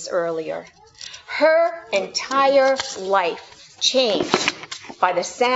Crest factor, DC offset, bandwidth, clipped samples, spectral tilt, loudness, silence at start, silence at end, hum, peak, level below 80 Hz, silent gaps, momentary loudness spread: 20 dB; under 0.1%; 8 kHz; under 0.1%; -2 dB/octave; -20 LUFS; 0 s; 0 s; none; 0 dBFS; -64 dBFS; none; 17 LU